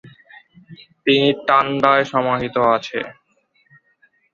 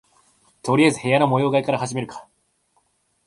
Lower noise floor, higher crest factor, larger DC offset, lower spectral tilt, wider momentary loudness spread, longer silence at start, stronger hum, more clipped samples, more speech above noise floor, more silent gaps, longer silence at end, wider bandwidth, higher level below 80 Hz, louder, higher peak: second, -62 dBFS vs -66 dBFS; about the same, 20 dB vs 20 dB; neither; about the same, -6 dB/octave vs -5.5 dB/octave; second, 11 LU vs 15 LU; second, 0.05 s vs 0.65 s; neither; neither; about the same, 45 dB vs 47 dB; neither; first, 1.2 s vs 1.05 s; second, 7.4 kHz vs 11.5 kHz; about the same, -58 dBFS vs -62 dBFS; first, -17 LUFS vs -20 LUFS; first, 0 dBFS vs -4 dBFS